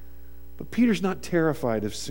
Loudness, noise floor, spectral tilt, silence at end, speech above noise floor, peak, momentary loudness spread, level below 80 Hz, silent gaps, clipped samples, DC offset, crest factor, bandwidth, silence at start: -25 LUFS; -47 dBFS; -6 dB/octave; 0 s; 22 dB; -10 dBFS; 9 LU; -48 dBFS; none; under 0.1%; 1%; 16 dB; 17 kHz; 0 s